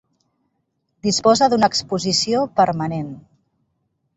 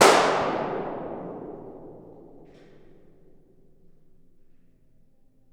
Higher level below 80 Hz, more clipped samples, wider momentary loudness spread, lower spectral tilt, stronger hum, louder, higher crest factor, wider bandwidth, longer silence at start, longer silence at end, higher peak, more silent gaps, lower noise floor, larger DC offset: about the same, -56 dBFS vs -58 dBFS; neither; second, 11 LU vs 28 LU; first, -4 dB/octave vs -2.5 dB/octave; neither; first, -18 LUFS vs -26 LUFS; second, 18 dB vs 28 dB; second, 8.2 kHz vs over 20 kHz; first, 1.05 s vs 0 s; second, 0.95 s vs 3.15 s; about the same, -2 dBFS vs 0 dBFS; neither; first, -72 dBFS vs -57 dBFS; neither